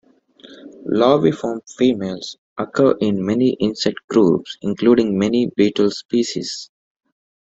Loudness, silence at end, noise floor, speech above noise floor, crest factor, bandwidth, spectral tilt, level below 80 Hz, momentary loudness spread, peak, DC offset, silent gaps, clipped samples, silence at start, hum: -18 LUFS; 0.95 s; -47 dBFS; 29 dB; 18 dB; 8 kHz; -6 dB/octave; -58 dBFS; 12 LU; -2 dBFS; under 0.1%; 2.38-2.56 s, 4.04-4.08 s; under 0.1%; 0.45 s; none